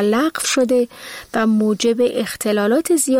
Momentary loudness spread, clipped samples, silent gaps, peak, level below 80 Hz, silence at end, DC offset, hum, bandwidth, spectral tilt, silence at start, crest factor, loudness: 6 LU; under 0.1%; none; -6 dBFS; -56 dBFS; 0 s; under 0.1%; none; 16.5 kHz; -3.5 dB/octave; 0 s; 12 dB; -18 LUFS